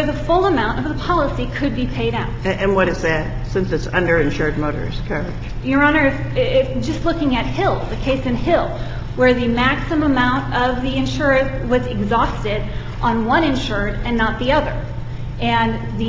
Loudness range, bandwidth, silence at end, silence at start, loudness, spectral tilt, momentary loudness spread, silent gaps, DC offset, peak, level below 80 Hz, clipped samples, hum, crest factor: 2 LU; 7.6 kHz; 0 s; 0 s; -19 LUFS; -6.5 dB/octave; 8 LU; none; under 0.1%; -2 dBFS; -28 dBFS; under 0.1%; none; 16 dB